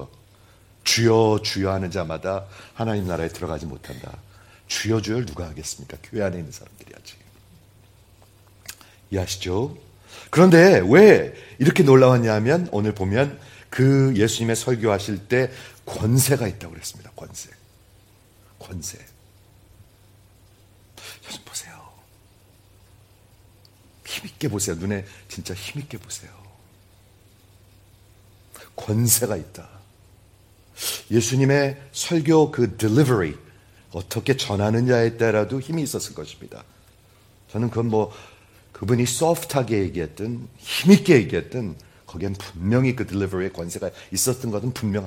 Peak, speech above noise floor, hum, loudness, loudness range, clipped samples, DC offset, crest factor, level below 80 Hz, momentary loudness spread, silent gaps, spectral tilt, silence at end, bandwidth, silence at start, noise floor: 0 dBFS; 33 dB; none; -21 LUFS; 23 LU; under 0.1%; under 0.1%; 22 dB; -52 dBFS; 21 LU; none; -5.5 dB/octave; 0 s; 16.5 kHz; 0 s; -54 dBFS